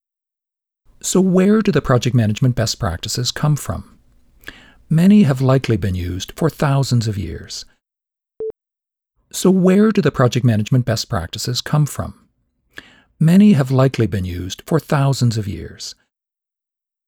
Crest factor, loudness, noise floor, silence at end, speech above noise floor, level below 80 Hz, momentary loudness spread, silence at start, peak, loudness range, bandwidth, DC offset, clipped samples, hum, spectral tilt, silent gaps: 14 dB; -16 LUFS; -87 dBFS; 1.15 s; 71 dB; -42 dBFS; 16 LU; 1.05 s; -4 dBFS; 4 LU; 17.5 kHz; under 0.1%; under 0.1%; none; -6 dB/octave; none